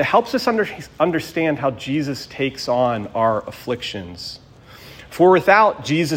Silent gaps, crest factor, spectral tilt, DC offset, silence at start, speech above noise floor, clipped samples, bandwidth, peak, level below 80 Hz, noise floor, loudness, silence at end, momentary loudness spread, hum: none; 18 dB; -5.5 dB/octave; under 0.1%; 0 s; 24 dB; under 0.1%; 16.5 kHz; 0 dBFS; -54 dBFS; -43 dBFS; -19 LUFS; 0 s; 17 LU; none